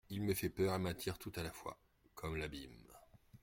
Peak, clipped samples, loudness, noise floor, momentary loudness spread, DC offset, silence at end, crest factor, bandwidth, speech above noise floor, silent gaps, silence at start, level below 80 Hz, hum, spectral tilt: -24 dBFS; under 0.1%; -42 LUFS; -64 dBFS; 23 LU; under 0.1%; 0.05 s; 18 dB; 16.5 kHz; 23 dB; none; 0.1 s; -60 dBFS; none; -5.5 dB/octave